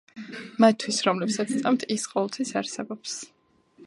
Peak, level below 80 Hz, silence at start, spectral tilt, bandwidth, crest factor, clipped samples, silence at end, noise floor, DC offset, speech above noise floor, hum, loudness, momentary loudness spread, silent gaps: -4 dBFS; -76 dBFS; 0.15 s; -4 dB/octave; 11.5 kHz; 22 dB; under 0.1%; 0 s; -57 dBFS; under 0.1%; 32 dB; none; -26 LUFS; 16 LU; none